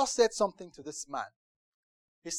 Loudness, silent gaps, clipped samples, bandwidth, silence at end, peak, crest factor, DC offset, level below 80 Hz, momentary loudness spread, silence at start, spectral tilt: -32 LUFS; 1.36-2.22 s; under 0.1%; 13 kHz; 0 s; -12 dBFS; 20 dB; under 0.1%; -66 dBFS; 18 LU; 0 s; -2 dB/octave